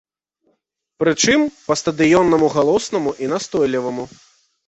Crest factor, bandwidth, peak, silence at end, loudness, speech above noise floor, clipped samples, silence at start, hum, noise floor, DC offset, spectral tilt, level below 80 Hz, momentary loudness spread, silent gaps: 16 dB; 8.4 kHz; -2 dBFS; 0.6 s; -17 LUFS; 52 dB; under 0.1%; 1 s; none; -69 dBFS; under 0.1%; -4 dB/octave; -52 dBFS; 9 LU; none